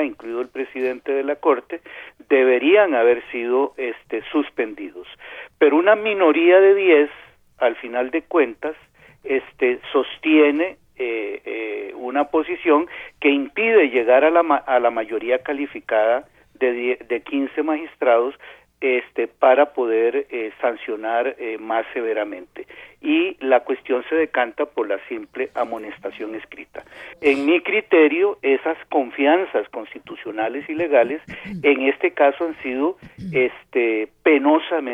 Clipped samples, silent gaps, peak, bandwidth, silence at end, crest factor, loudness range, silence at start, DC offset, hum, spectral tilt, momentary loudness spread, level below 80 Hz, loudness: under 0.1%; none; -2 dBFS; 5.4 kHz; 0 s; 18 dB; 6 LU; 0 s; under 0.1%; none; -6.5 dB/octave; 15 LU; -62 dBFS; -20 LUFS